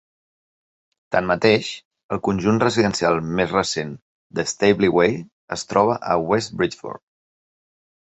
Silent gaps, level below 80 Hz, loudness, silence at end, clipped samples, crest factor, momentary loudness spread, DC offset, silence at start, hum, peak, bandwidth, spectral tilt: 1.85-1.91 s, 2.03-2.09 s, 4.02-4.30 s, 5.32-5.48 s; -52 dBFS; -20 LUFS; 1.1 s; under 0.1%; 20 dB; 14 LU; under 0.1%; 1.1 s; none; -2 dBFS; 8.2 kHz; -5 dB/octave